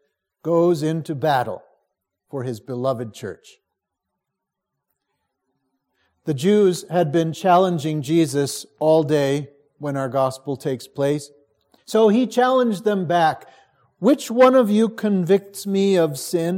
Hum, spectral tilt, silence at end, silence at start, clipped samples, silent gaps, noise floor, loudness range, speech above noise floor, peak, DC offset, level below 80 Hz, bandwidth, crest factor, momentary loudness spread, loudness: none; -6 dB/octave; 0 s; 0.45 s; under 0.1%; none; -82 dBFS; 13 LU; 62 dB; -2 dBFS; under 0.1%; -70 dBFS; 16.5 kHz; 18 dB; 13 LU; -20 LUFS